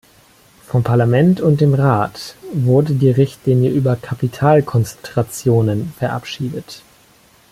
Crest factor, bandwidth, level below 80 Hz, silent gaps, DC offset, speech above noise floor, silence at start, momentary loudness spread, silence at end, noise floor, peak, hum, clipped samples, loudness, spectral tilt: 14 dB; 15 kHz; -50 dBFS; none; under 0.1%; 35 dB; 0.7 s; 11 LU; 0.75 s; -50 dBFS; -2 dBFS; none; under 0.1%; -16 LUFS; -7.5 dB/octave